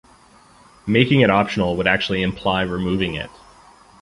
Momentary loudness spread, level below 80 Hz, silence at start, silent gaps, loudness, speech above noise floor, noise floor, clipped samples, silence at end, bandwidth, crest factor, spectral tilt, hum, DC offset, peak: 12 LU; -44 dBFS; 0.85 s; none; -19 LUFS; 31 dB; -50 dBFS; under 0.1%; 0.75 s; 11.5 kHz; 20 dB; -6.5 dB/octave; none; under 0.1%; 0 dBFS